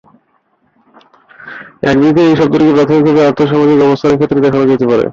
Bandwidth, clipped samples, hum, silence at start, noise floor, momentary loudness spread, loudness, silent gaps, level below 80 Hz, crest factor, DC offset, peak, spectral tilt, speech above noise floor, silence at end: 7.4 kHz; under 0.1%; none; 1.4 s; -57 dBFS; 7 LU; -9 LUFS; none; -46 dBFS; 10 dB; under 0.1%; 0 dBFS; -7.5 dB/octave; 48 dB; 0 s